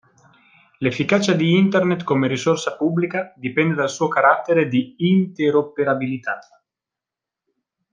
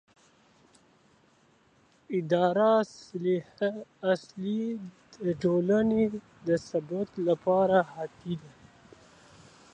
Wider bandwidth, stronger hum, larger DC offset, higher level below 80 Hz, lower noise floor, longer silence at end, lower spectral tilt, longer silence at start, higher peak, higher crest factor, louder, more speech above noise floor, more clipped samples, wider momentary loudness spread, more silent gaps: about the same, 9.4 kHz vs 9.2 kHz; neither; neither; about the same, -64 dBFS vs -66 dBFS; first, -87 dBFS vs -64 dBFS; first, 1.5 s vs 1.25 s; second, -6 dB/octave vs -7.5 dB/octave; second, 0.8 s vs 2.1 s; first, -2 dBFS vs -10 dBFS; about the same, 18 dB vs 20 dB; first, -19 LUFS vs -29 LUFS; first, 68 dB vs 36 dB; neither; second, 8 LU vs 13 LU; neither